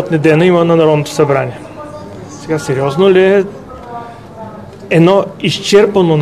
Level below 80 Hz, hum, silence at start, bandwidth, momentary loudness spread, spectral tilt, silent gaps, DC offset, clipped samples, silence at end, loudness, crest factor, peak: -46 dBFS; none; 0 s; 13.5 kHz; 21 LU; -6 dB/octave; none; 0.3%; 0.2%; 0 s; -11 LUFS; 12 dB; 0 dBFS